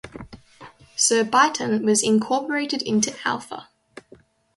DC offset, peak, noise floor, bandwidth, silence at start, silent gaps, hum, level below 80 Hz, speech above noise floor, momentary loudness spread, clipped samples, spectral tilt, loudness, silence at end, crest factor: under 0.1%; -4 dBFS; -53 dBFS; 11.5 kHz; 0.05 s; none; none; -60 dBFS; 32 dB; 19 LU; under 0.1%; -2.5 dB/octave; -21 LUFS; 0.95 s; 20 dB